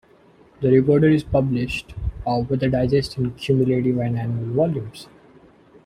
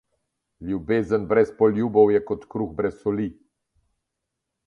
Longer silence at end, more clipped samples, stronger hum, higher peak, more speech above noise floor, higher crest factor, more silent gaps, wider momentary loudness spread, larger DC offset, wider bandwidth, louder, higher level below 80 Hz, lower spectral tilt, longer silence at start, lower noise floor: second, 0.8 s vs 1.35 s; neither; neither; about the same, -4 dBFS vs -4 dBFS; second, 33 dB vs 60 dB; about the same, 16 dB vs 20 dB; neither; about the same, 11 LU vs 12 LU; neither; first, 11.5 kHz vs 6.8 kHz; about the same, -21 LUFS vs -23 LUFS; first, -40 dBFS vs -54 dBFS; about the same, -8 dB/octave vs -9 dB/octave; about the same, 0.6 s vs 0.6 s; second, -52 dBFS vs -82 dBFS